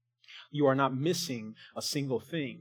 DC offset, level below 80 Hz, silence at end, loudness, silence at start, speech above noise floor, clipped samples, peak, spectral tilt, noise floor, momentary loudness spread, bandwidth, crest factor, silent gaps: under 0.1%; -84 dBFS; 0 s; -31 LUFS; 0.3 s; 23 dB; under 0.1%; -12 dBFS; -5 dB/octave; -54 dBFS; 16 LU; 19 kHz; 20 dB; none